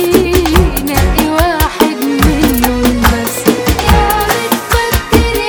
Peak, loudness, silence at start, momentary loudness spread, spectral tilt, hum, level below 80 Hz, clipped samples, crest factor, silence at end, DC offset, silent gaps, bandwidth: 0 dBFS; -11 LUFS; 0 s; 3 LU; -5 dB/octave; none; -18 dBFS; 1%; 10 dB; 0 s; under 0.1%; none; over 20 kHz